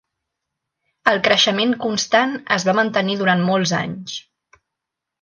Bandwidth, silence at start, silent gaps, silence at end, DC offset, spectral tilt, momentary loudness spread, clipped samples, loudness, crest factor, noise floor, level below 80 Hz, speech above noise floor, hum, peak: 10 kHz; 1.05 s; none; 1 s; under 0.1%; -4 dB/octave; 11 LU; under 0.1%; -18 LUFS; 20 dB; -83 dBFS; -62 dBFS; 64 dB; none; 0 dBFS